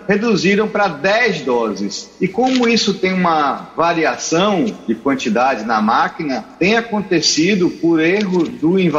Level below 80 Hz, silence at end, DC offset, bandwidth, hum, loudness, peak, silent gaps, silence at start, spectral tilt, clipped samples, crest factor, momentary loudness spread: -54 dBFS; 0 s; under 0.1%; 8 kHz; none; -16 LUFS; 0 dBFS; none; 0 s; -4.5 dB/octave; under 0.1%; 16 dB; 6 LU